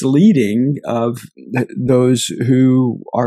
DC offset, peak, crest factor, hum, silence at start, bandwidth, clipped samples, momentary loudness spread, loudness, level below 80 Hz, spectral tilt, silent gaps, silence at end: under 0.1%; 0 dBFS; 14 dB; none; 0 s; 13.5 kHz; under 0.1%; 10 LU; -15 LUFS; -56 dBFS; -6.5 dB/octave; none; 0 s